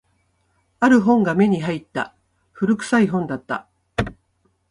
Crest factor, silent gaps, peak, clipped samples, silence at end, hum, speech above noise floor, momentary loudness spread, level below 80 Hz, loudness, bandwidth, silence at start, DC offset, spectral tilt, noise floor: 18 dB; none; -4 dBFS; under 0.1%; 0.6 s; none; 48 dB; 14 LU; -48 dBFS; -20 LUFS; 11 kHz; 0.8 s; under 0.1%; -6.5 dB/octave; -66 dBFS